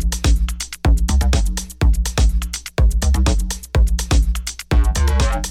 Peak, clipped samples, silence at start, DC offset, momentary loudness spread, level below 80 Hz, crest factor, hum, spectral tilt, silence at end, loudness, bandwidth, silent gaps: -4 dBFS; under 0.1%; 0 s; under 0.1%; 6 LU; -16 dBFS; 12 dB; none; -4.5 dB/octave; 0 s; -19 LUFS; 14.5 kHz; none